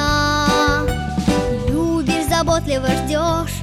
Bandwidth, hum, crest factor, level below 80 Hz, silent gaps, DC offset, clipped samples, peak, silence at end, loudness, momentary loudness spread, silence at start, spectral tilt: 16.5 kHz; none; 14 dB; -28 dBFS; none; under 0.1%; under 0.1%; -4 dBFS; 0 s; -18 LUFS; 4 LU; 0 s; -5 dB/octave